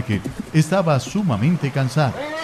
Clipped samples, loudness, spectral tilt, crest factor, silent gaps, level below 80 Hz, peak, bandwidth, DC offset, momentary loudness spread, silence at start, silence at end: under 0.1%; -20 LUFS; -6.5 dB/octave; 14 dB; none; -46 dBFS; -6 dBFS; 14 kHz; under 0.1%; 4 LU; 0 s; 0 s